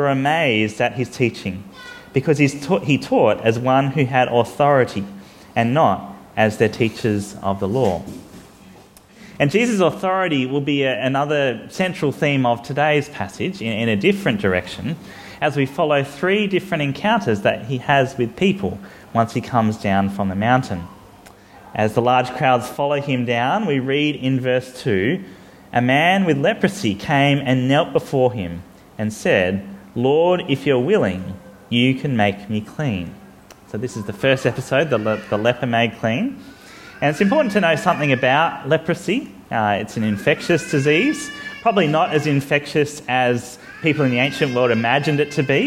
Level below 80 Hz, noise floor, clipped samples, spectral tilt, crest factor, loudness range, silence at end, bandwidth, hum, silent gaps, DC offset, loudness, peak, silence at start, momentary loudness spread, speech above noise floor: -54 dBFS; -46 dBFS; under 0.1%; -6 dB/octave; 18 dB; 3 LU; 0 s; 16 kHz; none; none; under 0.1%; -19 LUFS; 0 dBFS; 0 s; 11 LU; 27 dB